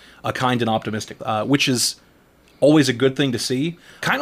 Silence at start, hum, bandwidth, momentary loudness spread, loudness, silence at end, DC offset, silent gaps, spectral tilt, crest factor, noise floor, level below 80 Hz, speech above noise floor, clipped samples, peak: 0.25 s; none; 16 kHz; 12 LU; -20 LUFS; 0 s; under 0.1%; none; -4.5 dB/octave; 16 dB; -53 dBFS; -58 dBFS; 34 dB; under 0.1%; -4 dBFS